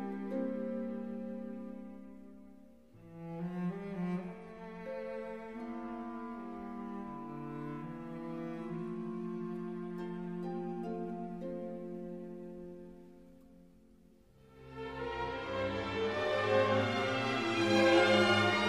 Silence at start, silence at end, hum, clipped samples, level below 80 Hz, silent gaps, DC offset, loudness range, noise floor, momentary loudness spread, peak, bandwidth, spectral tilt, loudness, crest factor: 0 s; 0 s; none; under 0.1%; -64 dBFS; none; under 0.1%; 12 LU; -63 dBFS; 19 LU; -14 dBFS; 12.5 kHz; -5.5 dB/octave; -36 LUFS; 22 dB